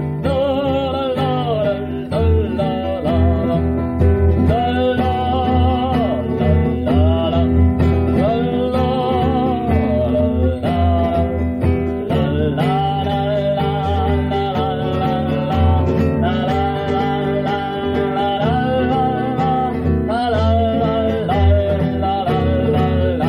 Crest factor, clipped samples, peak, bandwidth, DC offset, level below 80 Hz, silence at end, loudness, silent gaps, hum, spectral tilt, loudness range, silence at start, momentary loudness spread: 12 dB; under 0.1%; -4 dBFS; 5.4 kHz; under 0.1%; -26 dBFS; 0 s; -17 LUFS; none; none; -9 dB/octave; 2 LU; 0 s; 4 LU